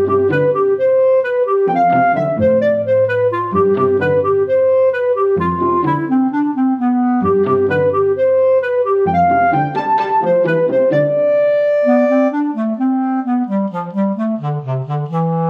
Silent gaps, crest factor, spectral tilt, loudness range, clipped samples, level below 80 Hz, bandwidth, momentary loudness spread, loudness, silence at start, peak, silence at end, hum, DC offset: none; 12 dB; -9.5 dB/octave; 2 LU; under 0.1%; -58 dBFS; 5.6 kHz; 6 LU; -15 LUFS; 0 s; -2 dBFS; 0 s; none; under 0.1%